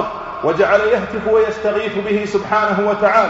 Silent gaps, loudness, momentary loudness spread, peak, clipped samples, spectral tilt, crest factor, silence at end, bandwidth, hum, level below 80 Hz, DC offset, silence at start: none; -16 LUFS; 6 LU; 0 dBFS; under 0.1%; -3.5 dB/octave; 16 dB; 0 s; 8 kHz; none; -46 dBFS; under 0.1%; 0 s